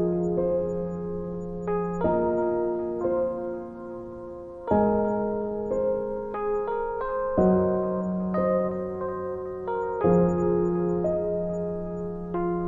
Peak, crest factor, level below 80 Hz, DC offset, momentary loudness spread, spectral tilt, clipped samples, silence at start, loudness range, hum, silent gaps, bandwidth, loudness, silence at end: -10 dBFS; 16 dB; -48 dBFS; under 0.1%; 10 LU; -10.5 dB/octave; under 0.1%; 0 s; 2 LU; none; none; 7.4 kHz; -27 LUFS; 0 s